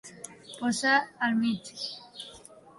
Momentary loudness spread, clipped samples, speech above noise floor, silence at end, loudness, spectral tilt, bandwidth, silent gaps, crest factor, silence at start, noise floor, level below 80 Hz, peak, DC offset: 20 LU; under 0.1%; 23 dB; 0.4 s; -28 LUFS; -3 dB/octave; 11.5 kHz; none; 18 dB; 0.05 s; -51 dBFS; -72 dBFS; -12 dBFS; under 0.1%